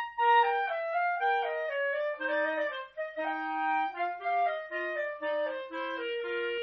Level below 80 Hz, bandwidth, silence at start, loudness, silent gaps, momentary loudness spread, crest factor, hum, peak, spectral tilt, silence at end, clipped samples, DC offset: -76 dBFS; 6 kHz; 0 s; -31 LUFS; none; 9 LU; 16 dB; none; -14 dBFS; 2 dB/octave; 0 s; under 0.1%; under 0.1%